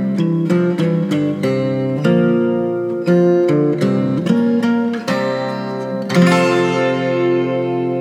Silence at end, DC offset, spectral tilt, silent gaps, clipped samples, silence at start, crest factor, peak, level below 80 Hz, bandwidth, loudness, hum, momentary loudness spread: 0 s; under 0.1%; -7.5 dB/octave; none; under 0.1%; 0 s; 14 dB; 0 dBFS; -70 dBFS; 11.5 kHz; -16 LUFS; none; 6 LU